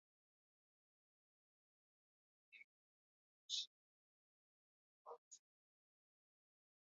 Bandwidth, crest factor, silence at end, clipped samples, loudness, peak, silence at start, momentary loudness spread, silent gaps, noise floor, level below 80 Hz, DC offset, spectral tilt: 6 kHz; 30 dB; 1.55 s; under 0.1%; -50 LUFS; -32 dBFS; 2.5 s; 21 LU; 2.64-3.49 s, 3.67-5.05 s, 5.18-5.31 s; under -90 dBFS; under -90 dBFS; under 0.1%; 6.5 dB/octave